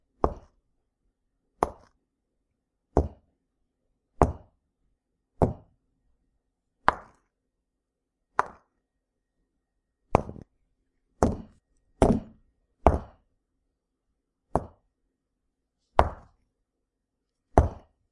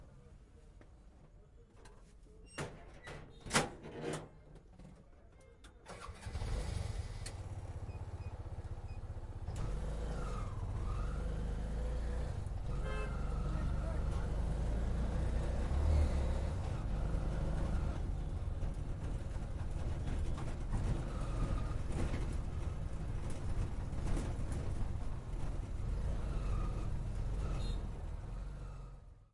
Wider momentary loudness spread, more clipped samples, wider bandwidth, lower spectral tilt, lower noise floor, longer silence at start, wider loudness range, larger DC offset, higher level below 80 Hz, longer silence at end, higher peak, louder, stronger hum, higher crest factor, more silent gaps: about the same, 16 LU vs 15 LU; neither; about the same, 11.5 kHz vs 11.5 kHz; first, -7.5 dB/octave vs -6 dB/octave; first, -83 dBFS vs -59 dBFS; first, 0.25 s vs 0 s; second, 5 LU vs 8 LU; neither; about the same, -40 dBFS vs -40 dBFS; first, 0.4 s vs 0.1 s; first, -2 dBFS vs -16 dBFS; first, -28 LUFS vs -41 LUFS; neither; first, 30 dB vs 22 dB; neither